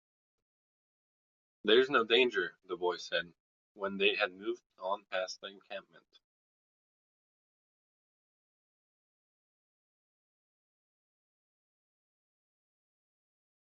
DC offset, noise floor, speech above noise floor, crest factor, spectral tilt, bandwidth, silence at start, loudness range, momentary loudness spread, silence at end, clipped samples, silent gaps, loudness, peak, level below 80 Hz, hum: under 0.1%; under -90 dBFS; over 57 dB; 26 dB; -0.5 dB/octave; 7.4 kHz; 1.65 s; 13 LU; 19 LU; 7.85 s; under 0.1%; 3.40-3.75 s, 4.66-4.70 s; -32 LUFS; -12 dBFS; -82 dBFS; none